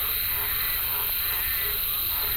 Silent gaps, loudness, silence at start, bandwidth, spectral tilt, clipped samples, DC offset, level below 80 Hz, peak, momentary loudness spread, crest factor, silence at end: none; -24 LUFS; 0 s; 17 kHz; -0.5 dB/octave; under 0.1%; under 0.1%; -42 dBFS; -14 dBFS; 0 LU; 14 dB; 0 s